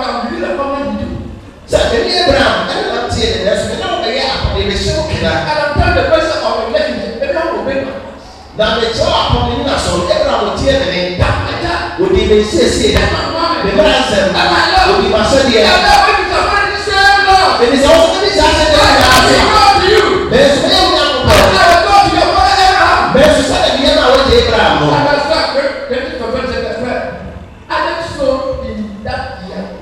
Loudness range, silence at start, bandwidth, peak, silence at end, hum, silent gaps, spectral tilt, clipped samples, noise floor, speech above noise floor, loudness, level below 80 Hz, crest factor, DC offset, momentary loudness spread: 7 LU; 0 s; 17 kHz; 0 dBFS; 0 s; none; none; -4 dB/octave; under 0.1%; -31 dBFS; 21 dB; -10 LUFS; -26 dBFS; 10 dB; under 0.1%; 11 LU